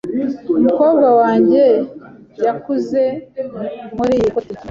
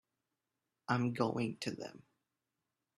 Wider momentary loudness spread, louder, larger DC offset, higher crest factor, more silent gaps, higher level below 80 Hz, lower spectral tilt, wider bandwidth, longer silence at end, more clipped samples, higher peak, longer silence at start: about the same, 14 LU vs 15 LU; first, -15 LUFS vs -37 LUFS; neither; second, 14 dB vs 24 dB; neither; first, -50 dBFS vs -76 dBFS; first, -8 dB/octave vs -6 dB/octave; second, 7.4 kHz vs 12.5 kHz; second, 0 s vs 1.05 s; neither; first, -2 dBFS vs -18 dBFS; second, 0.05 s vs 0.9 s